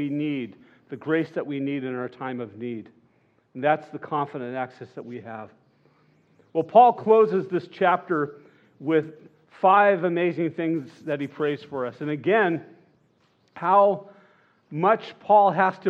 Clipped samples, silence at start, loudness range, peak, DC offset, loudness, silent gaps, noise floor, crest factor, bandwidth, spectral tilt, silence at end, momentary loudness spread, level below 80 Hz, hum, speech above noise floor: under 0.1%; 0 s; 9 LU; -4 dBFS; under 0.1%; -23 LUFS; none; -64 dBFS; 20 dB; 6.8 kHz; -8.5 dB/octave; 0 s; 19 LU; -84 dBFS; none; 41 dB